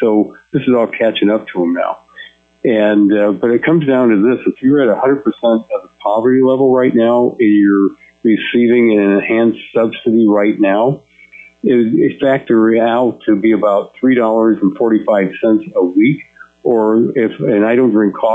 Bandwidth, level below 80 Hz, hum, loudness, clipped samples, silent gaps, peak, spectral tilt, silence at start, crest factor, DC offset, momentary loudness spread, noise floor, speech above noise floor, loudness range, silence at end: 3.8 kHz; -58 dBFS; none; -13 LUFS; under 0.1%; none; -2 dBFS; -9 dB/octave; 0 s; 10 dB; under 0.1%; 6 LU; -40 dBFS; 29 dB; 2 LU; 0 s